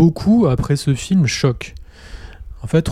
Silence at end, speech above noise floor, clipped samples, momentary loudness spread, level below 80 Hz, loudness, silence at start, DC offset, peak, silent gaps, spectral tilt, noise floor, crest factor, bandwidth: 0 s; 20 dB; under 0.1%; 23 LU; -36 dBFS; -16 LUFS; 0 s; under 0.1%; -2 dBFS; none; -6.5 dB/octave; -35 dBFS; 14 dB; 14 kHz